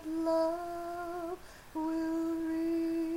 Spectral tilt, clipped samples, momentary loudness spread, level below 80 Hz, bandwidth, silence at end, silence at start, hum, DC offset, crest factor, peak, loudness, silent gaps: -5.5 dB/octave; under 0.1%; 10 LU; -60 dBFS; 16 kHz; 0 s; 0 s; none; under 0.1%; 12 dB; -22 dBFS; -35 LUFS; none